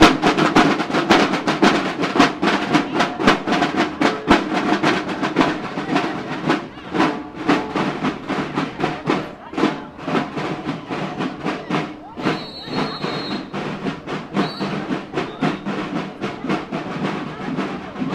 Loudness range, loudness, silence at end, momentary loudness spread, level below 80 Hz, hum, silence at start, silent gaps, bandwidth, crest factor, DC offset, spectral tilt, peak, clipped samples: 8 LU; -21 LUFS; 0 s; 11 LU; -46 dBFS; none; 0 s; none; 14 kHz; 20 dB; under 0.1%; -5 dB/octave; 0 dBFS; under 0.1%